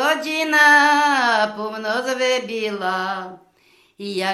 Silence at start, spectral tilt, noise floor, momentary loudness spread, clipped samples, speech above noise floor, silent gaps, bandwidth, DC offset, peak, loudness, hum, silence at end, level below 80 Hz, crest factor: 0 s; -2.5 dB/octave; -57 dBFS; 16 LU; under 0.1%; 38 dB; none; 14.5 kHz; under 0.1%; -2 dBFS; -18 LUFS; none; 0 s; -76 dBFS; 18 dB